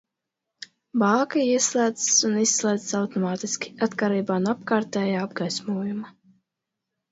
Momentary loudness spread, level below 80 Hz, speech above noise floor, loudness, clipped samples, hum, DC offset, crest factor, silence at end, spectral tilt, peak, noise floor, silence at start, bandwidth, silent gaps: 11 LU; -72 dBFS; 60 dB; -23 LUFS; under 0.1%; none; under 0.1%; 18 dB; 1 s; -3.5 dB/octave; -6 dBFS; -84 dBFS; 0.95 s; 8 kHz; none